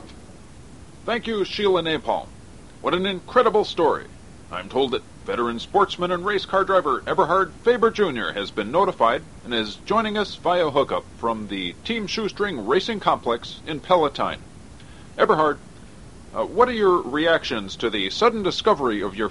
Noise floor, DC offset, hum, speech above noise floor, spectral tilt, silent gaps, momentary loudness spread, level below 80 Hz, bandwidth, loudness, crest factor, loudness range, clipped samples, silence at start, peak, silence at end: -44 dBFS; 0.4%; none; 22 dB; -5 dB/octave; none; 9 LU; -50 dBFS; 11.5 kHz; -22 LUFS; 20 dB; 3 LU; under 0.1%; 0 s; -2 dBFS; 0 s